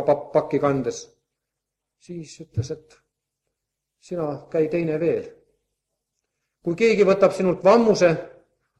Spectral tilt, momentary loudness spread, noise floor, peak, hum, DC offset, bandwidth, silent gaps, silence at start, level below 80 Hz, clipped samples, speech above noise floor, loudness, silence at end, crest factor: -6.5 dB/octave; 20 LU; -83 dBFS; -4 dBFS; none; under 0.1%; 11 kHz; none; 0 s; -60 dBFS; under 0.1%; 62 dB; -21 LUFS; 0.5 s; 20 dB